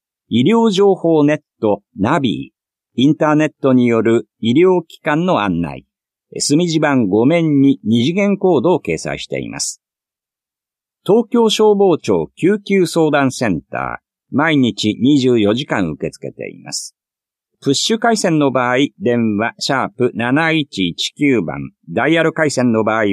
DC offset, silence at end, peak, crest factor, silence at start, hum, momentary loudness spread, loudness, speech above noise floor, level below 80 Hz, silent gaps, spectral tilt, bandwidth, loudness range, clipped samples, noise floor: under 0.1%; 0 s; -2 dBFS; 14 dB; 0.3 s; none; 12 LU; -15 LUFS; 73 dB; -52 dBFS; none; -5 dB/octave; 13.5 kHz; 3 LU; under 0.1%; -88 dBFS